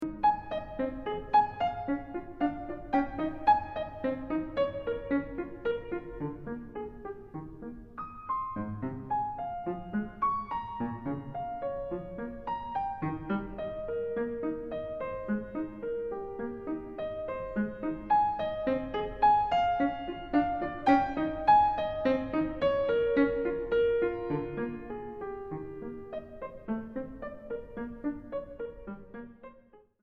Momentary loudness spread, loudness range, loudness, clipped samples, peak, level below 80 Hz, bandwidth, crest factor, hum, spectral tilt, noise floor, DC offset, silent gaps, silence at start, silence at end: 15 LU; 12 LU; -32 LUFS; under 0.1%; -12 dBFS; -52 dBFS; 6 kHz; 20 dB; none; -8 dB/octave; -59 dBFS; under 0.1%; none; 0 s; 0.25 s